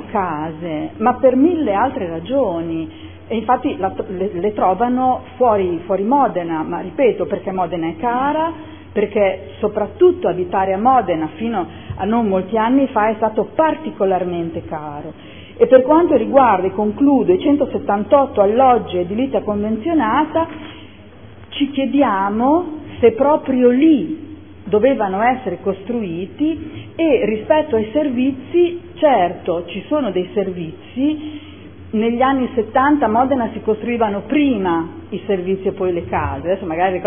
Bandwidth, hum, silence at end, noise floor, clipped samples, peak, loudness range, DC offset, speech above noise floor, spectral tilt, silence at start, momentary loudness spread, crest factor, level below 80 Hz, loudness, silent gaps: 3.6 kHz; none; 0 s; -40 dBFS; under 0.1%; 0 dBFS; 4 LU; 0.5%; 23 dB; -11 dB/octave; 0 s; 12 LU; 16 dB; -48 dBFS; -17 LUFS; none